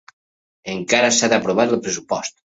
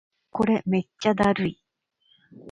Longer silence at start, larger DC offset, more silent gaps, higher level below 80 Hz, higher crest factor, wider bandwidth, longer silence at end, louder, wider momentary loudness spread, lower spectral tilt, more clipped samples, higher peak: first, 0.65 s vs 0.35 s; neither; neither; about the same, -60 dBFS vs -56 dBFS; about the same, 18 dB vs 18 dB; second, 8 kHz vs 10.5 kHz; first, 0.25 s vs 0 s; first, -18 LUFS vs -24 LUFS; first, 13 LU vs 7 LU; second, -2.5 dB/octave vs -7 dB/octave; neither; first, -2 dBFS vs -8 dBFS